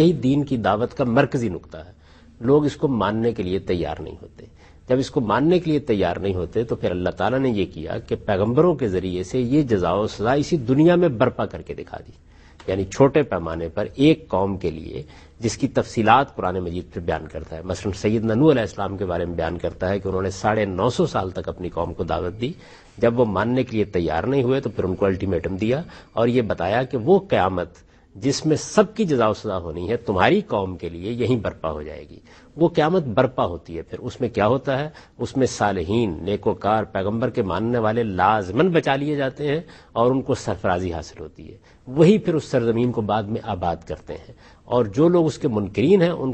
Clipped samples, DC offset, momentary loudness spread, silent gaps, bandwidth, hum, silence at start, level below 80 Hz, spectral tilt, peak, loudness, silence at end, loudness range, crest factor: under 0.1%; under 0.1%; 12 LU; none; 8.8 kHz; none; 0 s; -46 dBFS; -6.5 dB/octave; 0 dBFS; -21 LUFS; 0 s; 3 LU; 20 dB